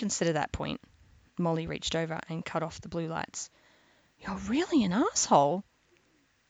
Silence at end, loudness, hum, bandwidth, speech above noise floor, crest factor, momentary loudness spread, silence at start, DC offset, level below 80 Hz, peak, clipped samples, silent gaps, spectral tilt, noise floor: 0.9 s; -30 LUFS; none; 9.4 kHz; 39 dB; 22 dB; 15 LU; 0 s; under 0.1%; -54 dBFS; -10 dBFS; under 0.1%; none; -4.5 dB/octave; -69 dBFS